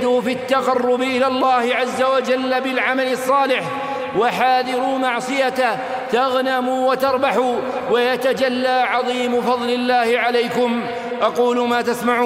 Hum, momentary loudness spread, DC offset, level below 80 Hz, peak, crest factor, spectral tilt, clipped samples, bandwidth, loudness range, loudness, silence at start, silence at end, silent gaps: none; 4 LU; under 0.1%; -64 dBFS; -2 dBFS; 16 dB; -4 dB/octave; under 0.1%; 16 kHz; 1 LU; -18 LUFS; 0 s; 0 s; none